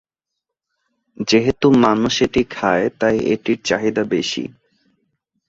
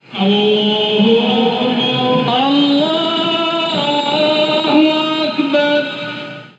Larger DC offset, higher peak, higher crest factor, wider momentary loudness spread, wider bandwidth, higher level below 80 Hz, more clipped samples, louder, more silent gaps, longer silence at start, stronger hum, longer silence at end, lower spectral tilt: neither; about the same, -2 dBFS vs 0 dBFS; about the same, 18 dB vs 14 dB; first, 8 LU vs 4 LU; about the same, 8 kHz vs 8 kHz; first, -48 dBFS vs -78 dBFS; neither; second, -17 LUFS vs -14 LUFS; neither; first, 1.2 s vs 0.1 s; neither; first, 1 s vs 0.1 s; about the same, -5 dB/octave vs -6 dB/octave